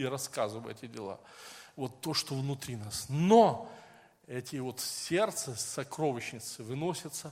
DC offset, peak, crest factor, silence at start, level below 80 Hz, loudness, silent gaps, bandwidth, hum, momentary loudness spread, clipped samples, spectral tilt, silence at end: under 0.1%; -10 dBFS; 24 dB; 0 s; -70 dBFS; -32 LUFS; none; 16.5 kHz; none; 18 LU; under 0.1%; -4.5 dB/octave; 0 s